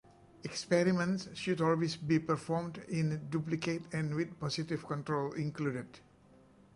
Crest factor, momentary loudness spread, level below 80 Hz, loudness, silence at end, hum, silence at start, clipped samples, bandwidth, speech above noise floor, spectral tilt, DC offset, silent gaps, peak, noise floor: 20 dB; 7 LU; -68 dBFS; -35 LUFS; 0.75 s; none; 0.45 s; under 0.1%; 11.5 kHz; 28 dB; -6 dB/octave; under 0.1%; none; -16 dBFS; -62 dBFS